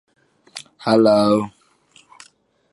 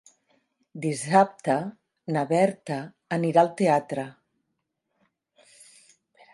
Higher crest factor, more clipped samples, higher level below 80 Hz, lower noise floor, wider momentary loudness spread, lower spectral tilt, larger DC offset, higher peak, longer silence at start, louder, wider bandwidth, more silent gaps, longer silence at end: about the same, 18 dB vs 22 dB; neither; first, -62 dBFS vs -76 dBFS; second, -55 dBFS vs -79 dBFS; first, 23 LU vs 15 LU; about the same, -6 dB/octave vs -6 dB/octave; neither; first, -2 dBFS vs -6 dBFS; second, 0.55 s vs 0.75 s; first, -17 LUFS vs -25 LUFS; about the same, 11.5 kHz vs 11.5 kHz; neither; second, 1.25 s vs 2.2 s